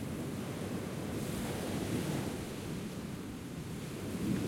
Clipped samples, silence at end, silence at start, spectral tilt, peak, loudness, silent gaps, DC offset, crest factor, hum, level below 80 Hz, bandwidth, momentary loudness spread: under 0.1%; 0 s; 0 s; -5.5 dB/octave; -24 dBFS; -39 LUFS; none; under 0.1%; 14 dB; none; -56 dBFS; 16.5 kHz; 7 LU